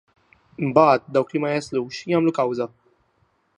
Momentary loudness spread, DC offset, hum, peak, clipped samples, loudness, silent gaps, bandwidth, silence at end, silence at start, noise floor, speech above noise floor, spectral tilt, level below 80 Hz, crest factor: 12 LU; under 0.1%; none; -2 dBFS; under 0.1%; -21 LUFS; none; 10 kHz; 0.9 s; 0.6 s; -66 dBFS; 45 dB; -6.5 dB/octave; -64 dBFS; 20 dB